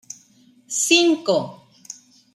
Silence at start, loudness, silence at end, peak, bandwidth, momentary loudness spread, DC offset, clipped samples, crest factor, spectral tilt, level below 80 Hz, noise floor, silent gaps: 0.7 s; -18 LUFS; 0.4 s; -4 dBFS; 13.5 kHz; 24 LU; under 0.1%; under 0.1%; 20 dB; -2 dB/octave; -76 dBFS; -55 dBFS; none